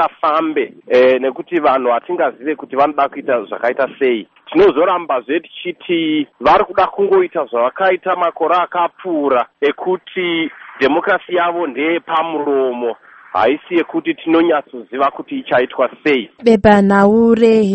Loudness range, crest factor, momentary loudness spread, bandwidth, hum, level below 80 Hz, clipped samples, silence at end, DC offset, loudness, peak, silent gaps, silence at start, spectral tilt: 3 LU; 14 dB; 9 LU; 8.4 kHz; none; -50 dBFS; under 0.1%; 0 s; under 0.1%; -15 LUFS; 0 dBFS; none; 0 s; -7 dB/octave